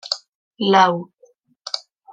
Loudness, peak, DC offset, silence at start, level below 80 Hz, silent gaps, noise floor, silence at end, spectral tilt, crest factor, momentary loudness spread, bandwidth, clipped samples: -19 LUFS; -2 dBFS; under 0.1%; 0.05 s; -74 dBFS; 0.28-0.51 s; -56 dBFS; 0.35 s; -4.5 dB/octave; 20 dB; 14 LU; 9.4 kHz; under 0.1%